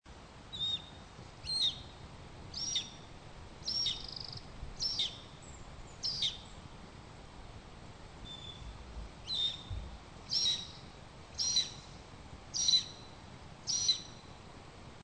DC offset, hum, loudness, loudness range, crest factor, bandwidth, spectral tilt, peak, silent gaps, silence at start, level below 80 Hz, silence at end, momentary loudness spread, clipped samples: under 0.1%; none; -34 LUFS; 8 LU; 22 dB; 9.2 kHz; -1 dB/octave; -18 dBFS; none; 0.05 s; -54 dBFS; 0 s; 22 LU; under 0.1%